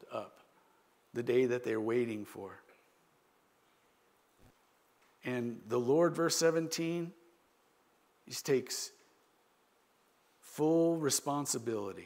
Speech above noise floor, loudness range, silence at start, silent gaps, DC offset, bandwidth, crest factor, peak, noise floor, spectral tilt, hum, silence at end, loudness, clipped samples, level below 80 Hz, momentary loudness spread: 38 dB; 9 LU; 0 s; none; under 0.1%; 16 kHz; 20 dB; -16 dBFS; -71 dBFS; -4 dB/octave; none; 0 s; -34 LUFS; under 0.1%; -84 dBFS; 16 LU